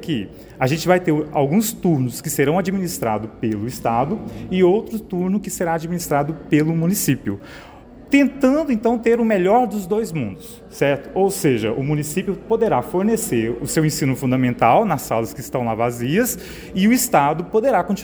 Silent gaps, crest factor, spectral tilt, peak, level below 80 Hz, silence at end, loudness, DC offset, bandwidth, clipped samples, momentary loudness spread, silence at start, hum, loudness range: none; 18 dB; -5.5 dB/octave; -2 dBFS; -46 dBFS; 0 s; -19 LUFS; under 0.1%; over 20 kHz; under 0.1%; 8 LU; 0 s; none; 2 LU